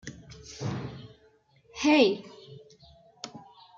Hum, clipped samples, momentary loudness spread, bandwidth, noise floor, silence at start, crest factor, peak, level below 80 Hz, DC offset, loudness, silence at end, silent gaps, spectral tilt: none; under 0.1%; 27 LU; 7.8 kHz; -63 dBFS; 0.05 s; 22 dB; -10 dBFS; -62 dBFS; under 0.1%; -26 LUFS; 0.35 s; none; -5 dB/octave